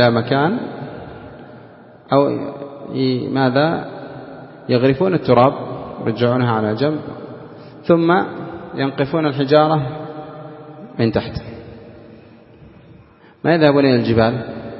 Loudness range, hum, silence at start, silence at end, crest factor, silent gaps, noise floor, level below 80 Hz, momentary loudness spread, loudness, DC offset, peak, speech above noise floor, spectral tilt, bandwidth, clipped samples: 4 LU; none; 0 s; 0 s; 18 dB; none; -46 dBFS; -50 dBFS; 21 LU; -17 LUFS; under 0.1%; 0 dBFS; 30 dB; -10.5 dB/octave; 5.8 kHz; under 0.1%